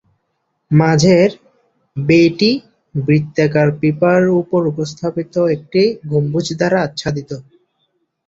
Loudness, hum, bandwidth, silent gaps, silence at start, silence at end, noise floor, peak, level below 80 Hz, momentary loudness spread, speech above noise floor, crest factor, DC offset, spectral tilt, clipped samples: -15 LUFS; none; 7.8 kHz; none; 0.7 s; 0.85 s; -69 dBFS; -2 dBFS; -50 dBFS; 11 LU; 55 dB; 14 dB; under 0.1%; -6.5 dB/octave; under 0.1%